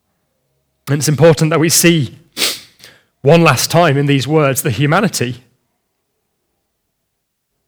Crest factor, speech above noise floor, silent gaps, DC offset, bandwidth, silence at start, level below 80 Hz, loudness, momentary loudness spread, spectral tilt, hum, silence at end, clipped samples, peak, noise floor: 14 dB; 59 dB; none; under 0.1%; over 20 kHz; 0.85 s; -52 dBFS; -12 LUFS; 12 LU; -4.5 dB/octave; none; 2.3 s; under 0.1%; 0 dBFS; -70 dBFS